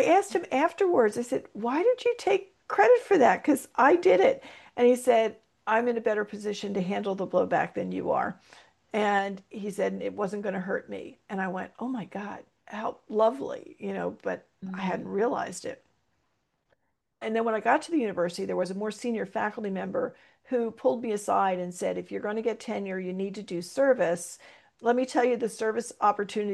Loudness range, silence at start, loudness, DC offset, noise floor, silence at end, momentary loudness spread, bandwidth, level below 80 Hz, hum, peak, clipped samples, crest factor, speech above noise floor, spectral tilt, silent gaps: 9 LU; 0 s; -28 LUFS; under 0.1%; -76 dBFS; 0 s; 14 LU; 12.5 kHz; -74 dBFS; none; -8 dBFS; under 0.1%; 20 dB; 49 dB; -5 dB/octave; none